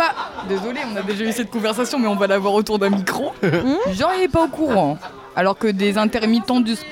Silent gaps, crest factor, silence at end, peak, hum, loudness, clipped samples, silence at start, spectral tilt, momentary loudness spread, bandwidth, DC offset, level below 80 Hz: none; 12 dB; 0 s; -6 dBFS; none; -19 LUFS; under 0.1%; 0 s; -5.5 dB/octave; 7 LU; 17 kHz; under 0.1%; -48 dBFS